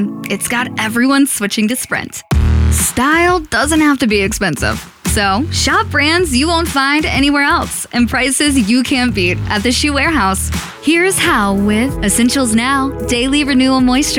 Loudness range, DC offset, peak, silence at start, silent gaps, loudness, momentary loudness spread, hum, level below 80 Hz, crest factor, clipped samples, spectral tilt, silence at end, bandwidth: 1 LU; under 0.1%; -2 dBFS; 0 s; none; -13 LUFS; 5 LU; none; -26 dBFS; 10 dB; under 0.1%; -4 dB/octave; 0 s; 18.5 kHz